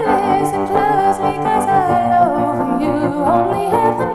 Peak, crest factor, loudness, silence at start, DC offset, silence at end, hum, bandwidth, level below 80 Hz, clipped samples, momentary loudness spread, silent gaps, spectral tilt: -2 dBFS; 14 dB; -15 LUFS; 0 s; under 0.1%; 0 s; none; 13.5 kHz; -44 dBFS; under 0.1%; 4 LU; none; -6.5 dB/octave